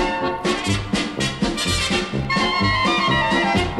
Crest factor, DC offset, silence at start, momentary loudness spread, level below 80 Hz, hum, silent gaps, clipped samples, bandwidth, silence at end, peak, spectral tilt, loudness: 12 dB; 0.1%; 0 s; 5 LU; -36 dBFS; none; none; under 0.1%; 14 kHz; 0 s; -8 dBFS; -4 dB/octave; -20 LUFS